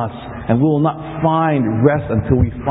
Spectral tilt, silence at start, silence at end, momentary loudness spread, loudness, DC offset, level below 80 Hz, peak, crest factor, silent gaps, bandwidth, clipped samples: -13 dB/octave; 0 s; 0 s; 5 LU; -16 LUFS; under 0.1%; -32 dBFS; 0 dBFS; 16 dB; none; 4 kHz; under 0.1%